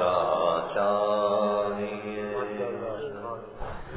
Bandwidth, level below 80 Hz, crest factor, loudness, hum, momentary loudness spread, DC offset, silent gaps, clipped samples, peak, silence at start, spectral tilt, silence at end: 4 kHz; -52 dBFS; 16 dB; -28 LUFS; none; 13 LU; under 0.1%; none; under 0.1%; -12 dBFS; 0 s; -9.5 dB/octave; 0 s